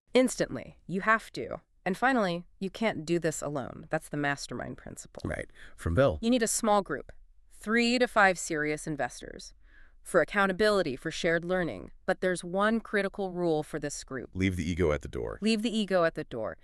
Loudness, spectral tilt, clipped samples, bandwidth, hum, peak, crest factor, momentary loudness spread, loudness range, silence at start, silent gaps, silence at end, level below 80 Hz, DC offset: -29 LUFS; -4.5 dB/octave; under 0.1%; 13.5 kHz; none; -8 dBFS; 20 dB; 13 LU; 4 LU; 0.15 s; none; 0.1 s; -50 dBFS; under 0.1%